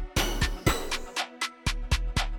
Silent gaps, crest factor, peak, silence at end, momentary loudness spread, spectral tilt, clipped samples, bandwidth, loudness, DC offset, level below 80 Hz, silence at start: none; 18 dB; -10 dBFS; 0 s; 5 LU; -3.5 dB/octave; under 0.1%; 19 kHz; -30 LUFS; under 0.1%; -32 dBFS; 0 s